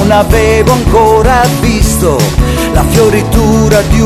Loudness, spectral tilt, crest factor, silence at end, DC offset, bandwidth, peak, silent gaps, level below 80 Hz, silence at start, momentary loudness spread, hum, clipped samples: -8 LUFS; -5.5 dB/octave; 8 dB; 0 s; under 0.1%; 15 kHz; 0 dBFS; none; -14 dBFS; 0 s; 3 LU; none; 4%